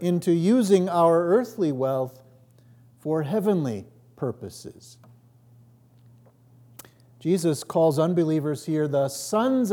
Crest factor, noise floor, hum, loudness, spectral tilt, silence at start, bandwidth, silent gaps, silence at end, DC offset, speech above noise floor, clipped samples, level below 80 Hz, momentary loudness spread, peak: 18 dB; -54 dBFS; none; -24 LUFS; -7 dB/octave; 0 s; 18.5 kHz; none; 0 s; under 0.1%; 32 dB; under 0.1%; -74 dBFS; 14 LU; -6 dBFS